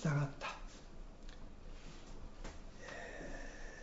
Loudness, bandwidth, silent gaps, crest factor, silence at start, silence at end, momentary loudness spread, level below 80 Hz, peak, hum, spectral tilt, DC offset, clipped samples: -48 LUFS; 7.6 kHz; none; 20 dB; 0 s; 0 s; 15 LU; -52 dBFS; -26 dBFS; none; -6 dB/octave; under 0.1%; under 0.1%